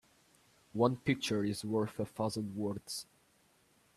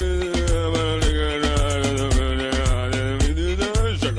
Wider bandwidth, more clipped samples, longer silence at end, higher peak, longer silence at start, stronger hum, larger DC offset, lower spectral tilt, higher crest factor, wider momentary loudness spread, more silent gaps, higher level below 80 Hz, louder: about the same, 14 kHz vs 13 kHz; neither; first, 0.95 s vs 0 s; second, -16 dBFS vs -10 dBFS; first, 0.75 s vs 0 s; neither; neither; about the same, -5.5 dB/octave vs -5 dB/octave; first, 22 dB vs 10 dB; first, 11 LU vs 2 LU; neither; second, -70 dBFS vs -24 dBFS; second, -36 LUFS vs -22 LUFS